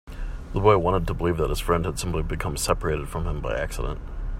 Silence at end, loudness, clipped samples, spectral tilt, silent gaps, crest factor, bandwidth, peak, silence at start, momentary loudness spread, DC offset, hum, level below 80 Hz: 0 s; -25 LUFS; under 0.1%; -5.5 dB/octave; none; 20 dB; 16 kHz; -4 dBFS; 0.05 s; 12 LU; under 0.1%; none; -32 dBFS